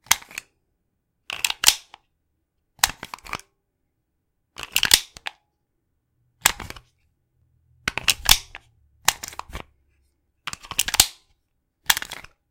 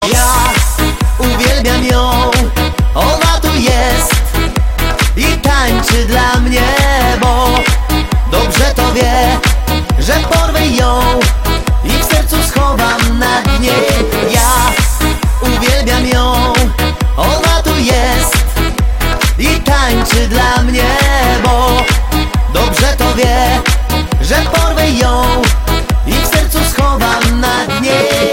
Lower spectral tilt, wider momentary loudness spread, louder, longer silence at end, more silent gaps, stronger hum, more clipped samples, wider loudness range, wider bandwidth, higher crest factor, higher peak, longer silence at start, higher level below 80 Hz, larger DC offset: second, 1 dB/octave vs -4 dB/octave; first, 20 LU vs 4 LU; second, -20 LUFS vs -11 LUFS; first, 0.3 s vs 0 s; neither; neither; neither; about the same, 2 LU vs 1 LU; about the same, 17 kHz vs 17 kHz; first, 28 dB vs 10 dB; about the same, 0 dBFS vs 0 dBFS; about the same, 0.1 s vs 0 s; second, -46 dBFS vs -14 dBFS; second, under 0.1% vs 0.5%